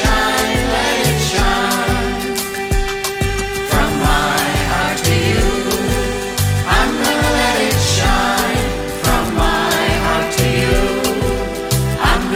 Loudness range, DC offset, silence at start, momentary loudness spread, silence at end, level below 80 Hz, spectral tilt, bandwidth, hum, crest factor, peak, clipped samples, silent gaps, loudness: 2 LU; under 0.1%; 0 s; 5 LU; 0 s; -24 dBFS; -4 dB/octave; 18 kHz; none; 16 dB; 0 dBFS; under 0.1%; none; -16 LUFS